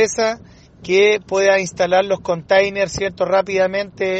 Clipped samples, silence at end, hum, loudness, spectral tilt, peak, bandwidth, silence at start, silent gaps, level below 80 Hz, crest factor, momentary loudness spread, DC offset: under 0.1%; 0 s; none; -17 LUFS; -3.5 dB/octave; -2 dBFS; 8.6 kHz; 0 s; none; -48 dBFS; 16 dB; 7 LU; under 0.1%